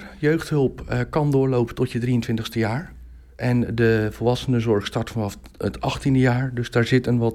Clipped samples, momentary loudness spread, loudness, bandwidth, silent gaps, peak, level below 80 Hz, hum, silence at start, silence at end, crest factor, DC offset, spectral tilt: under 0.1%; 8 LU; -22 LUFS; 14 kHz; none; -6 dBFS; -42 dBFS; none; 0 s; 0 s; 16 dB; under 0.1%; -7 dB/octave